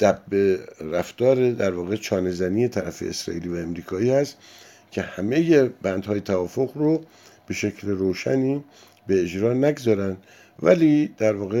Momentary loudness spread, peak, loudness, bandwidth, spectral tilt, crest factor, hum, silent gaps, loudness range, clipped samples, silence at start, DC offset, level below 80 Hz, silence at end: 11 LU; -4 dBFS; -23 LUFS; 16.5 kHz; -6.5 dB/octave; 18 dB; none; none; 3 LU; under 0.1%; 0 s; under 0.1%; -58 dBFS; 0 s